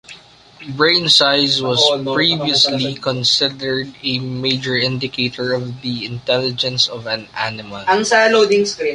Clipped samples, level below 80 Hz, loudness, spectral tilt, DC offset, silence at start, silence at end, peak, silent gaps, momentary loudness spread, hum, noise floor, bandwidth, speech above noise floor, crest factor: under 0.1%; -56 dBFS; -16 LUFS; -3.5 dB/octave; under 0.1%; 0.1 s; 0 s; 0 dBFS; none; 12 LU; none; -42 dBFS; 11.5 kHz; 25 dB; 18 dB